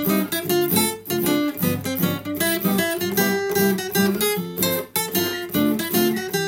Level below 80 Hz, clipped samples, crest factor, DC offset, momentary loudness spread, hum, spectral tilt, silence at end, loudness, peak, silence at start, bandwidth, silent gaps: -60 dBFS; under 0.1%; 16 dB; under 0.1%; 4 LU; none; -4 dB/octave; 0 s; -21 LUFS; -4 dBFS; 0 s; 17 kHz; none